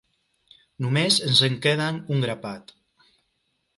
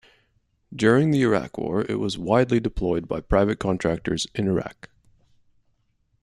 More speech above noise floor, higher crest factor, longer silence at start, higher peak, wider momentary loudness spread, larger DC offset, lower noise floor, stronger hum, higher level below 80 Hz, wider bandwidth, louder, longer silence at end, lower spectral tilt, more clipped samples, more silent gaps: first, 50 dB vs 46 dB; about the same, 22 dB vs 20 dB; about the same, 0.8 s vs 0.7 s; about the same, -4 dBFS vs -4 dBFS; first, 16 LU vs 8 LU; neither; first, -73 dBFS vs -68 dBFS; neither; second, -64 dBFS vs -40 dBFS; about the same, 11.5 kHz vs 12.5 kHz; about the same, -22 LUFS vs -23 LUFS; second, 1.15 s vs 1.5 s; second, -4 dB/octave vs -6.5 dB/octave; neither; neither